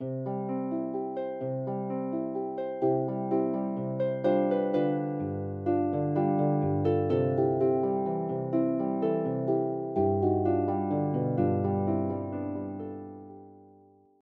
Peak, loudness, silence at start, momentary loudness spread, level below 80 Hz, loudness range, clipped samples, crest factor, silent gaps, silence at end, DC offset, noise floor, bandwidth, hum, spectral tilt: -14 dBFS; -29 LUFS; 0 s; 8 LU; -72 dBFS; 4 LU; under 0.1%; 14 dB; none; 0.6 s; under 0.1%; -58 dBFS; 4.8 kHz; none; -12 dB/octave